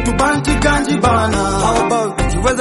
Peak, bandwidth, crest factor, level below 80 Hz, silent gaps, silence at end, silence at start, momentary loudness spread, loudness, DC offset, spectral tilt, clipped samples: -2 dBFS; 11.5 kHz; 14 dB; -24 dBFS; none; 0 s; 0 s; 3 LU; -15 LUFS; under 0.1%; -5 dB/octave; under 0.1%